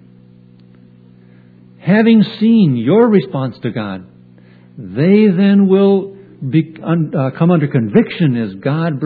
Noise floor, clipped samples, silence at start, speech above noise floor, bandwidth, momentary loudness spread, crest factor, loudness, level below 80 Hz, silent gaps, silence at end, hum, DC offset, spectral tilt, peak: -43 dBFS; under 0.1%; 1.85 s; 31 dB; 4.9 kHz; 14 LU; 14 dB; -13 LUFS; -60 dBFS; none; 0 s; none; under 0.1%; -11.5 dB/octave; 0 dBFS